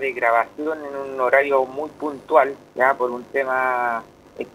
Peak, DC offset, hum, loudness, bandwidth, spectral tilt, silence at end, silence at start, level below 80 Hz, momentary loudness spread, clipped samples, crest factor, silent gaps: 0 dBFS; under 0.1%; 50 Hz at -55 dBFS; -21 LUFS; 15.5 kHz; -5 dB/octave; 0.05 s; 0 s; -64 dBFS; 11 LU; under 0.1%; 22 dB; none